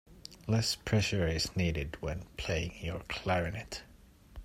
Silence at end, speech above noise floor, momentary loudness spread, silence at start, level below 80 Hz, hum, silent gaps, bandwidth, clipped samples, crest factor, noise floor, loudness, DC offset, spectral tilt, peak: 0 s; 22 dB; 12 LU; 0.1 s; -48 dBFS; none; none; 16 kHz; under 0.1%; 18 dB; -55 dBFS; -33 LUFS; under 0.1%; -5 dB/octave; -16 dBFS